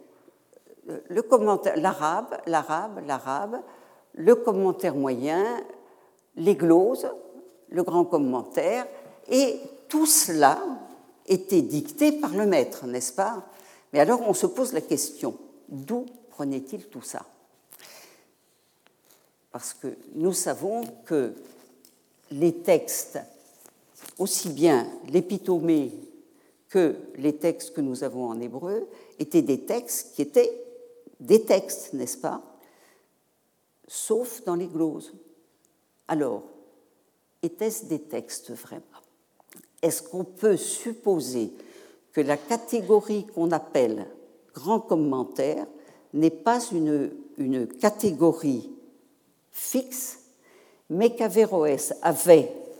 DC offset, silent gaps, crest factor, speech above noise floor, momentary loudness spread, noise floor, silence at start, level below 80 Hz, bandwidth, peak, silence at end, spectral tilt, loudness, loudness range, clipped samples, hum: under 0.1%; none; 24 dB; 45 dB; 17 LU; -70 dBFS; 0.85 s; -84 dBFS; over 20 kHz; -2 dBFS; 0 s; -4.5 dB/octave; -25 LUFS; 9 LU; under 0.1%; none